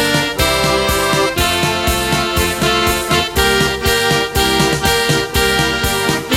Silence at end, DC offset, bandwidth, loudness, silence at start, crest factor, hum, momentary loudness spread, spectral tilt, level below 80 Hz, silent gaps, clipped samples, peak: 0 s; under 0.1%; 16.5 kHz; -14 LUFS; 0 s; 14 dB; none; 2 LU; -3 dB/octave; -28 dBFS; none; under 0.1%; -2 dBFS